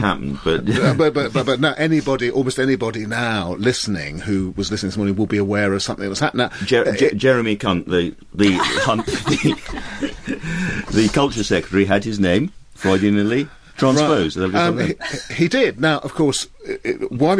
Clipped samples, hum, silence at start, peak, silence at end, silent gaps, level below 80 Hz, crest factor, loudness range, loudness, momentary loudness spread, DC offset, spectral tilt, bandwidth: under 0.1%; none; 0 s; -2 dBFS; 0 s; none; -42 dBFS; 16 dB; 3 LU; -19 LUFS; 8 LU; under 0.1%; -5 dB/octave; 11 kHz